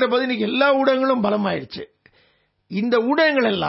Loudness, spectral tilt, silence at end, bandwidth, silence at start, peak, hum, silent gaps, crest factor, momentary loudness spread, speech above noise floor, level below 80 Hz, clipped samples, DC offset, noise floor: -19 LUFS; -9 dB/octave; 0 s; 5.8 kHz; 0 s; -4 dBFS; none; none; 16 dB; 12 LU; 43 dB; -62 dBFS; under 0.1%; under 0.1%; -62 dBFS